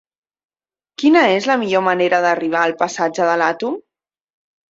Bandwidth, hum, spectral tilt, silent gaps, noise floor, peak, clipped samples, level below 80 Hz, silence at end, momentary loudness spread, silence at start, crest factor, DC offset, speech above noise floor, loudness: 7.8 kHz; none; -4.5 dB/octave; none; -77 dBFS; -2 dBFS; under 0.1%; -66 dBFS; 0.9 s; 6 LU; 1 s; 16 dB; under 0.1%; 62 dB; -16 LUFS